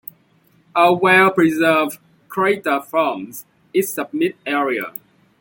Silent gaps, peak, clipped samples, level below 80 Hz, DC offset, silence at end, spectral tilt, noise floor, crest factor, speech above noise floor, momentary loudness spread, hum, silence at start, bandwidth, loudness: none; -2 dBFS; under 0.1%; -66 dBFS; under 0.1%; 0.5 s; -5 dB/octave; -57 dBFS; 16 dB; 40 dB; 19 LU; none; 0.75 s; 17 kHz; -17 LUFS